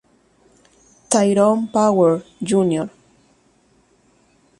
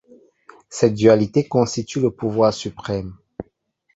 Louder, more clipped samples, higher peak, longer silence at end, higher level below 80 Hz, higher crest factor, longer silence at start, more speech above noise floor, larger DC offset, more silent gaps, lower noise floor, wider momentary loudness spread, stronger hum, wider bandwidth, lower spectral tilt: about the same, -17 LUFS vs -19 LUFS; neither; about the same, -2 dBFS vs -2 dBFS; first, 1.7 s vs 0.55 s; second, -62 dBFS vs -50 dBFS; about the same, 20 dB vs 18 dB; first, 1.1 s vs 0.7 s; second, 42 dB vs 47 dB; neither; neither; second, -58 dBFS vs -65 dBFS; second, 9 LU vs 20 LU; neither; first, 11.5 kHz vs 8 kHz; about the same, -5.5 dB/octave vs -6 dB/octave